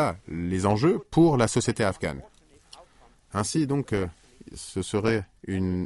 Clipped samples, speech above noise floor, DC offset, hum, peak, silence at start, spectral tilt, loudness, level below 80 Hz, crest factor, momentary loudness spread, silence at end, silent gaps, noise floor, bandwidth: under 0.1%; 31 dB; under 0.1%; none; -8 dBFS; 0 s; -6 dB/octave; -26 LUFS; -52 dBFS; 18 dB; 13 LU; 0 s; none; -57 dBFS; 11.5 kHz